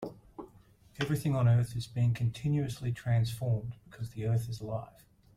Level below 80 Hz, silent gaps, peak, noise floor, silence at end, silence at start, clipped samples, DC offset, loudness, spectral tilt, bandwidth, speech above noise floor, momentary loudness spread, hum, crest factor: -58 dBFS; none; -16 dBFS; -60 dBFS; 0.5 s; 0 s; under 0.1%; under 0.1%; -32 LUFS; -7 dB/octave; 14 kHz; 29 dB; 17 LU; none; 16 dB